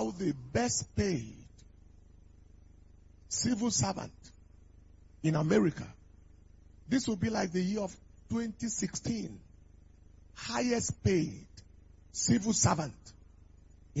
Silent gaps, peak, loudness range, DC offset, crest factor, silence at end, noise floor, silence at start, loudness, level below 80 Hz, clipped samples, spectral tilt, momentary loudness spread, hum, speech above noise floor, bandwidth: none; -14 dBFS; 4 LU; under 0.1%; 20 dB; 0 s; -57 dBFS; 0 s; -32 LUFS; -56 dBFS; under 0.1%; -4.5 dB/octave; 15 LU; 50 Hz at -60 dBFS; 26 dB; 8 kHz